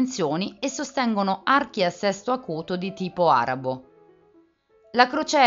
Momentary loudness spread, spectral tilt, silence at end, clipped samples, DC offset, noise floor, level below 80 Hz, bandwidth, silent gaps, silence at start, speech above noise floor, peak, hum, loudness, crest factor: 9 LU; -3 dB/octave; 0 s; under 0.1%; under 0.1%; -59 dBFS; -66 dBFS; 7.8 kHz; none; 0 s; 36 dB; 0 dBFS; none; -24 LUFS; 24 dB